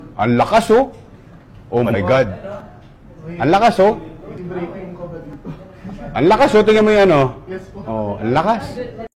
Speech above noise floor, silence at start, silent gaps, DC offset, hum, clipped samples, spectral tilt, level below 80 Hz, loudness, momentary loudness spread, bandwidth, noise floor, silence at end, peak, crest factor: 26 dB; 0 s; none; under 0.1%; none; under 0.1%; -6.5 dB/octave; -42 dBFS; -15 LUFS; 21 LU; 14 kHz; -41 dBFS; 0.1 s; -4 dBFS; 12 dB